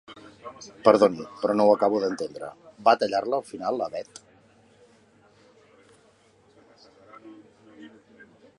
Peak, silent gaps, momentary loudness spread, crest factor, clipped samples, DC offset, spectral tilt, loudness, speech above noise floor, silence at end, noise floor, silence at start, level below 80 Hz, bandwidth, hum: -2 dBFS; none; 23 LU; 24 dB; under 0.1%; under 0.1%; -5.5 dB/octave; -24 LUFS; 36 dB; 0.7 s; -60 dBFS; 0.1 s; -70 dBFS; 11 kHz; none